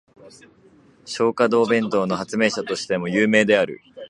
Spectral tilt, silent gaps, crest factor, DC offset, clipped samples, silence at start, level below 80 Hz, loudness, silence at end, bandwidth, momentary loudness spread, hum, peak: -5 dB/octave; none; 20 dB; under 0.1%; under 0.1%; 0.25 s; -64 dBFS; -20 LUFS; 0 s; 11 kHz; 8 LU; none; -2 dBFS